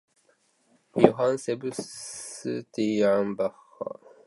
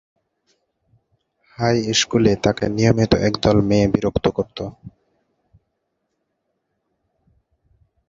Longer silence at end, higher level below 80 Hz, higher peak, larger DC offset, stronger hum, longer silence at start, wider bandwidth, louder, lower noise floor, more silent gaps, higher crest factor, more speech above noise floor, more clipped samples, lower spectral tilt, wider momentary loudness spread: second, 0.35 s vs 3.2 s; second, -68 dBFS vs -42 dBFS; about the same, 0 dBFS vs -2 dBFS; neither; neither; second, 0.95 s vs 1.6 s; first, 11.5 kHz vs 7.8 kHz; second, -27 LUFS vs -18 LUFS; second, -67 dBFS vs -74 dBFS; neither; first, 28 dB vs 20 dB; second, 41 dB vs 56 dB; neither; about the same, -5.5 dB/octave vs -5.5 dB/octave; first, 16 LU vs 9 LU